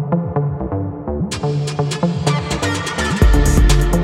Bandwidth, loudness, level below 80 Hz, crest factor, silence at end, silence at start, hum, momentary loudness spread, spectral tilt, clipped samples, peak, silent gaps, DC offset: 15 kHz; -18 LUFS; -20 dBFS; 16 dB; 0 s; 0 s; none; 9 LU; -5.5 dB/octave; under 0.1%; 0 dBFS; none; under 0.1%